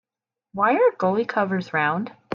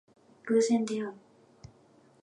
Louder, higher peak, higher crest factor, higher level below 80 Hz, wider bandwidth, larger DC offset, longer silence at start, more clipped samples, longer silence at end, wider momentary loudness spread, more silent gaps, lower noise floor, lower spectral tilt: first, -22 LUFS vs -29 LUFS; first, -8 dBFS vs -14 dBFS; about the same, 14 dB vs 18 dB; about the same, -72 dBFS vs -72 dBFS; second, 7 kHz vs 11 kHz; neither; about the same, 0.55 s vs 0.45 s; neither; second, 0 s vs 1.05 s; second, 7 LU vs 16 LU; neither; first, -89 dBFS vs -61 dBFS; first, -7.5 dB/octave vs -5 dB/octave